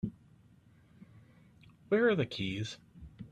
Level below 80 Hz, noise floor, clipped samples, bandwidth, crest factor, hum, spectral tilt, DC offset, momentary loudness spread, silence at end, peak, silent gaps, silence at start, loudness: -64 dBFS; -62 dBFS; under 0.1%; 10.5 kHz; 20 dB; none; -6 dB/octave; under 0.1%; 22 LU; 0.05 s; -16 dBFS; none; 0.05 s; -33 LUFS